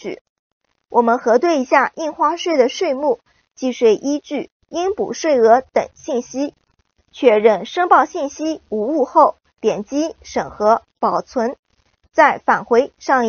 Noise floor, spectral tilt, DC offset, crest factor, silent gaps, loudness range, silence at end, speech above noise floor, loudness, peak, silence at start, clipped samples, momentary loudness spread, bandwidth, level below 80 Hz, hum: -63 dBFS; -2.5 dB/octave; under 0.1%; 18 dB; 0.21-0.61 s, 4.52-4.60 s, 11.59-11.63 s; 3 LU; 0 s; 46 dB; -17 LUFS; 0 dBFS; 0.05 s; under 0.1%; 11 LU; 6.8 kHz; -58 dBFS; none